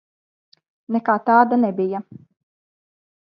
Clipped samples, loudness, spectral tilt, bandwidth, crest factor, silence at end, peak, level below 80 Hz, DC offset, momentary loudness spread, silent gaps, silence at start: under 0.1%; -19 LUFS; -10 dB/octave; 5.4 kHz; 20 dB; 1.3 s; -2 dBFS; -74 dBFS; under 0.1%; 10 LU; none; 0.9 s